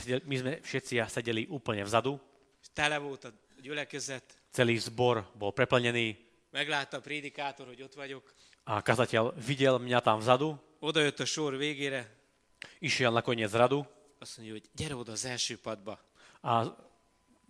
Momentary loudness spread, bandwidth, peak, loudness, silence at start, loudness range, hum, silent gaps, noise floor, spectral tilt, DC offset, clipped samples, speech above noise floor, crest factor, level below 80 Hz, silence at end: 18 LU; 13.5 kHz; -8 dBFS; -31 LUFS; 0 s; 5 LU; none; none; -68 dBFS; -4.5 dB/octave; under 0.1%; under 0.1%; 37 dB; 26 dB; -68 dBFS; 0.75 s